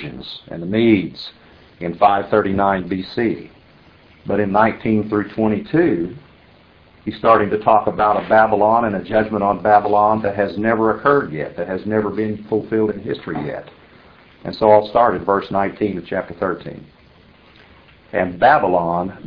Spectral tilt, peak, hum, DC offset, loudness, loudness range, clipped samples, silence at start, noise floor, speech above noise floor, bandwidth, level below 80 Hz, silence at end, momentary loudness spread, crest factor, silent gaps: -9.5 dB/octave; 0 dBFS; none; under 0.1%; -17 LUFS; 5 LU; under 0.1%; 0 s; -49 dBFS; 32 dB; 5.4 kHz; -48 dBFS; 0 s; 15 LU; 18 dB; none